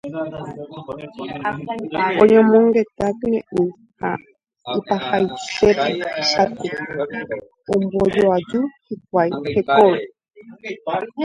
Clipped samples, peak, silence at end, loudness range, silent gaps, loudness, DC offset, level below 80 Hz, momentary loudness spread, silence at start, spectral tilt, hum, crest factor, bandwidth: under 0.1%; 0 dBFS; 0 s; 3 LU; none; -19 LUFS; under 0.1%; -52 dBFS; 17 LU; 0.05 s; -5.5 dB/octave; none; 20 dB; 9.4 kHz